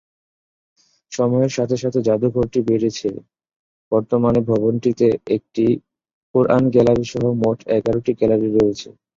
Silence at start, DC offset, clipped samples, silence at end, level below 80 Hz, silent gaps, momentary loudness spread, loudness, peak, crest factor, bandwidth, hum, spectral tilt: 1.1 s; under 0.1%; under 0.1%; 0.3 s; -48 dBFS; 3.56-3.91 s, 6.13-6.34 s; 7 LU; -18 LUFS; -2 dBFS; 18 dB; 7.6 kHz; none; -7.5 dB/octave